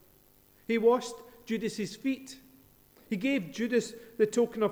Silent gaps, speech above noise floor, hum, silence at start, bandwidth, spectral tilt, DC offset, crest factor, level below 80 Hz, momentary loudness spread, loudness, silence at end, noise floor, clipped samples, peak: none; 32 dB; 50 Hz at -70 dBFS; 0.7 s; over 20 kHz; -5 dB/octave; under 0.1%; 18 dB; -68 dBFS; 18 LU; -31 LUFS; 0 s; -61 dBFS; under 0.1%; -12 dBFS